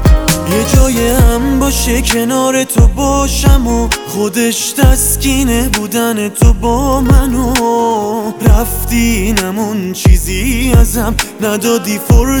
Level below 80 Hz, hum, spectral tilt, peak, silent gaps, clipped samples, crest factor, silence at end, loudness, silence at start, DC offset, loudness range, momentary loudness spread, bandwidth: -14 dBFS; none; -5 dB/octave; 0 dBFS; none; 0.4%; 10 dB; 0 s; -12 LUFS; 0 s; under 0.1%; 1 LU; 4 LU; over 20 kHz